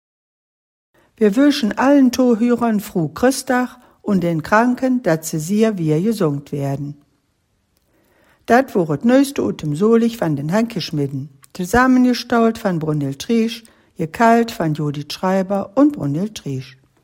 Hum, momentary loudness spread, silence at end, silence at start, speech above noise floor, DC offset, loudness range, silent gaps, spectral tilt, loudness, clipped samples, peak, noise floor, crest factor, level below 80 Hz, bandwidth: none; 11 LU; 0.35 s; 1.2 s; 48 dB; under 0.1%; 4 LU; none; -6 dB/octave; -17 LUFS; under 0.1%; 0 dBFS; -65 dBFS; 18 dB; -50 dBFS; 16.5 kHz